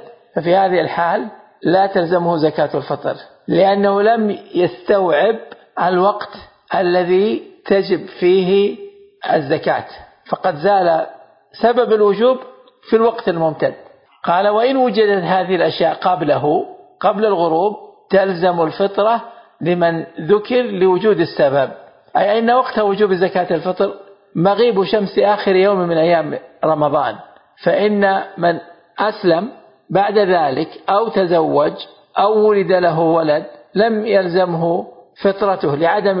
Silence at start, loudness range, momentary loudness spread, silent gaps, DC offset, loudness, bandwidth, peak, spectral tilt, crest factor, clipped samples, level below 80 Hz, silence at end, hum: 0.35 s; 2 LU; 9 LU; none; under 0.1%; -16 LUFS; 5.4 kHz; -2 dBFS; -11.5 dB/octave; 14 dB; under 0.1%; -60 dBFS; 0 s; none